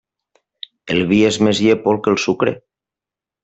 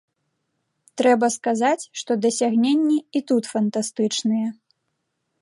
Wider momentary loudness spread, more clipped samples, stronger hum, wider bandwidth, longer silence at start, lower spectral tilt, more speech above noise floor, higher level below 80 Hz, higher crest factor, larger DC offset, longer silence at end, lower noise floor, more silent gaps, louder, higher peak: first, 20 LU vs 7 LU; neither; neither; second, 8.2 kHz vs 11.5 kHz; about the same, 0.85 s vs 0.95 s; about the same, -5 dB/octave vs -4 dB/octave; first, 73 dB vs 55 dB; first, -56 dBFS vs -76 dBFS; about the same, 16 dB vs 16 dB; neither; about the same, 0.85 s vs 0.9 s; first, -88 dBFS vs -76 dBFS; neither; first, -16 LUFS vs -21 LUFS; first, -2 dBFS vs -6 dBFS